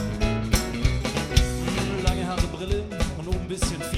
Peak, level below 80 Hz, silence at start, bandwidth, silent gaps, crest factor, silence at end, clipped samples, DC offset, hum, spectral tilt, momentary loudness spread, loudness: -4 dBFS; -28 dBFS; 0 s; 16 kHz; none; 20 dB; 0 s; under 0.1%; under 0.1%; none; -5 dB/octave; 5 LU; -26 LUFS